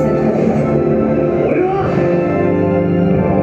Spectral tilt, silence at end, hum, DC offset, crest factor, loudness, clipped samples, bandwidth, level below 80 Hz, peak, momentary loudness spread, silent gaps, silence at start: -10 dB/octave; 0 s; none; under 0.1%; 12 dB; -14 LUFS; under 0.1%; 7.8 kHz; -34 dBFS; -2 dBFS; 1 LU; none; 0 s